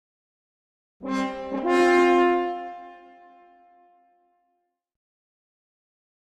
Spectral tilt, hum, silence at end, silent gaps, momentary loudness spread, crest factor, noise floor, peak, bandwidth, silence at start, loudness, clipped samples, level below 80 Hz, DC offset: -5 dB/octave; none; 3.3 s; none; 21 LU; 18 dB; -75 dBFS; -8 dBFS; 9.8 kHz; 1 s; -22 LUFS; under 0.1%; -64 dBFS; under 0.1%